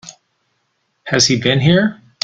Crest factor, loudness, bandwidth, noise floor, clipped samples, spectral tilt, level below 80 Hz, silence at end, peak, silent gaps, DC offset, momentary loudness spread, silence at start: 18 dB; -14 LUFS; 9.4 kHz; -67 dBFS; under 0.1%; -4 dB/octave; -48 dBFS; 0.3 s; 0 dBFS; none; under 0.1%; 8 LU; 0.05 s